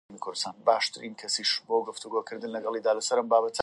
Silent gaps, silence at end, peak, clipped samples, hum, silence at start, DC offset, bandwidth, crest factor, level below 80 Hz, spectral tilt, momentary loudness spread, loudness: none; 0 s; -8 dBFS; under 0.1%; none; 0.1 s; under 0.1%; 11.5 kHz; 20 dB; -80 dBFS; -1.5 dB/octave; 9 LU; -28 LUFS